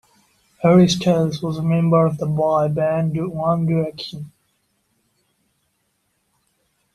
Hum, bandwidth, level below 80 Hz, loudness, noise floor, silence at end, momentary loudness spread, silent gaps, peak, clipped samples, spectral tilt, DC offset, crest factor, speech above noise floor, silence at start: none; 11.5 kHz; -54 dBFS; -18 LUFS; -69 dBFS; 2.65 s; 13 LU; none; -2 dBFS; under 0.1%; -7 dB/octave; under 0.1%; 18 dB; 51 dB; 0.6 s